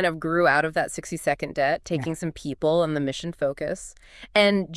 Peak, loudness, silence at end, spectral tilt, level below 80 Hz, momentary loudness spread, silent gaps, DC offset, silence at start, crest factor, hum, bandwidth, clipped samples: -6 dBFS; -24 LUFS; 0 s; -5 dB/octave; -52 dBFS; 11 LU; none; under 0.1%; 0 s; 18 dB; none; 12 kHz; under 0.1%